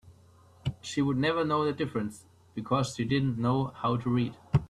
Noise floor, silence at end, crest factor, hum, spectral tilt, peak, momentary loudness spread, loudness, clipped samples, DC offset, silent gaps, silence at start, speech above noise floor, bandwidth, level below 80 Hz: -58 dBFS; 0.05 s; 18 dB; none; -6.5 dB/octave; -12 dBFS; 11 LU; -30 LUFS; under 0.1%; under 0.1%; none; 0.05 s; 29 dB; 12 kHz; -54 dBFS